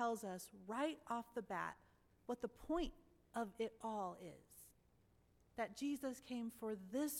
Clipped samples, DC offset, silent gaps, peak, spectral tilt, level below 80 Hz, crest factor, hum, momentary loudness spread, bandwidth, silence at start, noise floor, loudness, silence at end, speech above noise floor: under 0.1%; under 0.1%; none; -28 dBFS; -4.5 dB/octave; -66 dBFS; 18 dB; none; 14 LU; 18 kHz; 0 s; -74 dBFS; -47 LUFS; 0 s; 28 dB